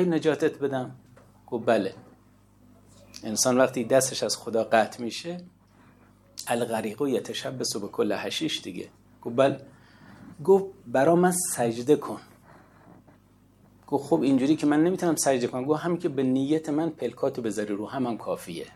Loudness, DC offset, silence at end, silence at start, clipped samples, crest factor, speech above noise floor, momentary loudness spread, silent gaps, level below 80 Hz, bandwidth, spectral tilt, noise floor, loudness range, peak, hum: -26 LUFS; under 0.1%; 0.05 s; 0 s; under 0.1%; 20 dB; 33 dB; 13 LU; none; -68 dBFS; 15.5 kHz; -4.5 dB/octave; -58 dBFS; 5 LU; -6 dBFS; 50 Hz at -55 dBFS